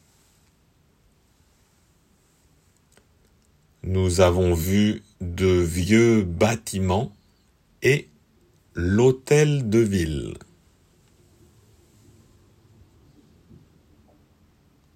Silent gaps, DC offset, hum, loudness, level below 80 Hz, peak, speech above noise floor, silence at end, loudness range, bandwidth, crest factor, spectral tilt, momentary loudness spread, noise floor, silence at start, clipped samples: none; under 0.1%; none; -21 LUFS; -50 dBFS; -4 dBFS; 41 dB; 4.55 s; 7 LU; 16 kHz; 20 dB; -6 dB/octave; 14 LU; -62 dBFS; 3.85 s; under 0.1%